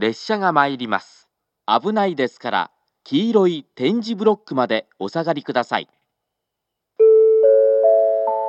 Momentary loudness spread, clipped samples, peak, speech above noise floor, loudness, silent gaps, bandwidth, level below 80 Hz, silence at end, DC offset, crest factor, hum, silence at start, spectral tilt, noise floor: 11 LU; under 0.1%; 0 dBFS; 60 dB; -18 LUFS; none; 7.4 kHz; -82 dBFS; 0 s; under 0.1%; 18 dB; none; 0 s; -6.5 dB/octave; -80 dBFS